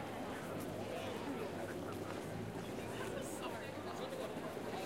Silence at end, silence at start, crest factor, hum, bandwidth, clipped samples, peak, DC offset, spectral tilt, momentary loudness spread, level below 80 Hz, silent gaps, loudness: 0 s; 0 s; 16 dB; none; 16 kHz; under 0.1%; -28 dBFS; under 0.1%; -5 dB/octave; 2 LU; -66 dBFS; none; -44 LUFS